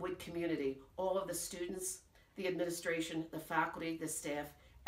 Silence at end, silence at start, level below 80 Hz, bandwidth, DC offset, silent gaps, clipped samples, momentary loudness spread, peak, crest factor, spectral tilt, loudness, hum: 0 s; 0 s; -66 dBFS; 16 kHz; under 0.1%; none; under 0.1%; 6 LU; -22 dBFS; 18 dB; -3.5 dB/octave; -40 LUFS; none